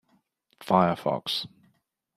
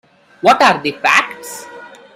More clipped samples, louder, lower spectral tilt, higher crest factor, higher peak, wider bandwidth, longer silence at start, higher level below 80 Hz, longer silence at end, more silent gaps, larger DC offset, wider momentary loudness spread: neither; second, -26 LUFS vs -12 LUFS; first, -6 dB/octave vs -2.5 dB/octave; first, 24 dB vs 16 dB; second, -6 dBFS vs 0 dBFS; second, 13.5 kHz vs 16.5 kHz; first, 0.6 s vs 0.45 s; second, -68 dBFS vs -60 dBFS; first, 0.7 s vs 0.3 s; neither; neither; about the same, 18 LU vs 20 LU